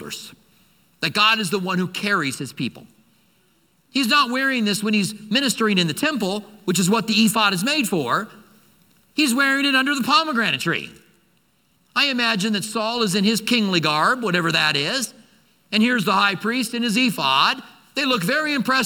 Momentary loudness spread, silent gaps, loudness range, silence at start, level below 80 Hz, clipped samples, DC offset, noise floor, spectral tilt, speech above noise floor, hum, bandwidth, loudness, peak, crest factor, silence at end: 9 LU; none; 3 LU; 0 s; -68 dBFS; under 0.1%; under 0.1%; -63 dBFS; -3.5 dB/octave; 43 dB; none; 19 kHz; -20 LUFS; -2 dBFS; 20 dB; 0 s